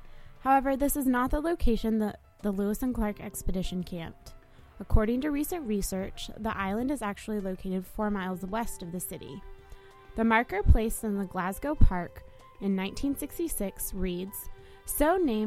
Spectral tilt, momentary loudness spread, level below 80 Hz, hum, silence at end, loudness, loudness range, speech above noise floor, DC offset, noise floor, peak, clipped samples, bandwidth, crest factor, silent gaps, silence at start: -5.5 dB/octave; 12 LU; -34 dBFS; none; 0 s; -30 LUFS; 4 LU; 22 dB; under 0.1%; -50 dBFS; -4 dBFS; under 0.1%; 16 kHz; 24 dB; none; 0 s